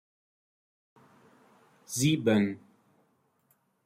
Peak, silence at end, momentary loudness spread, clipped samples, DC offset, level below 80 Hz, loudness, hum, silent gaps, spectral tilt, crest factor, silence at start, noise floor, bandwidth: -14 dBFS; 1.3 s; 13 LU; under 0.1%; under 0.1%; -72 dBFS; -28 LUFS; none; none; -5 dB/octave; 20 dB; 1.9 s; -72 dBFS; 16 kHz